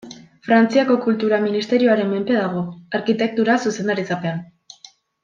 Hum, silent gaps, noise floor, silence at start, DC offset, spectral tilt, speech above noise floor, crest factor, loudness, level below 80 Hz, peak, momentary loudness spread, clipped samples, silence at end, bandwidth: none; none; -48 dBFS; 0.05 s; under 0.1%; -6 dB/octave; 30 dB; 16 dB; -19 LUFS; -66 dBFS; -2 dBFS; 9 LU; under 0.1%; 0.8 s; 7.4 kHz